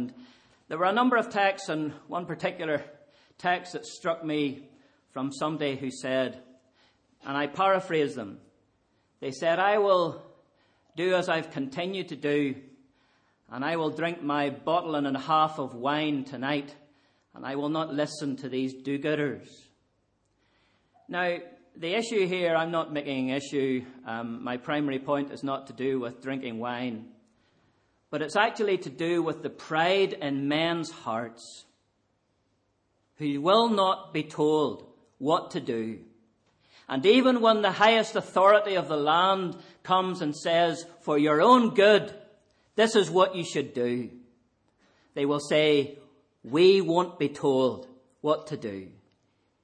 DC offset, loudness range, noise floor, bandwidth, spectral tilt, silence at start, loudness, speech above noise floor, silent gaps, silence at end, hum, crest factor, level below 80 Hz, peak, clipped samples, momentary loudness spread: under 0.1%; 9 LU; -73 dBFS; 10 kHz; -5 dB/octave; 0 s; -27 LUFS; 46 dB; none; 0.75 s; none; 22 dB; -74 dBFS; -6 dBFS; under 0.1%; 15 LU